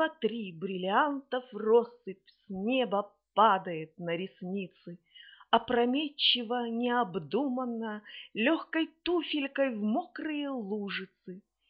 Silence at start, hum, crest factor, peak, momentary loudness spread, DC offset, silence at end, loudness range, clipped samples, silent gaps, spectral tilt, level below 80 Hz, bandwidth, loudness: 0 s; none; 24 dB; -8 dBFS; 17 LU; under 0.1%; 0.3 s; 3 LU; under 0.1%; none; -2.5 dB/octave; -74 dBFS; 5.6 kHz; -31 LUFS